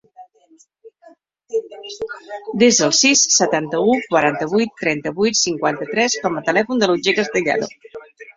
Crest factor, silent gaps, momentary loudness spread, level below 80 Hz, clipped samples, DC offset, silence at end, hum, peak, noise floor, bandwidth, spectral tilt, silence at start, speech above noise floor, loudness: 18 dB; none; 17 LU; -60 dBFS; under 0.1%; under 0.1%; 0.05 s; none; -2 dBFS; -54 dBFS; 7.8 kHz; -2.5 dB/octave; 0.2 s; 36 dB; -17 LUFS